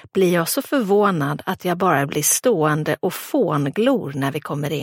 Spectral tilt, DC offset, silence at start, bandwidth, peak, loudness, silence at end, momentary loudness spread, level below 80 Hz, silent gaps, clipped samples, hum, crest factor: -4.5 dB/octave; under 0.1%; 0.15 s; 17 kHz; -4 dBFS; -20 LUFS; 0 s; 7 LU; -62 dBFS; none; under 0.1%; none; 16 dB